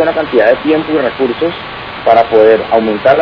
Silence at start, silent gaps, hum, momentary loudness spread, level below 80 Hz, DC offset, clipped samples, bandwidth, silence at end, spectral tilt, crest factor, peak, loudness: 0 s; none; none; 9 LU; -44 dBFS; under 0.1%; 1%; 5.4 kHz; 0 s; -7.5 dB/octave; 10 dB; 0 dBFS; -11 LUFS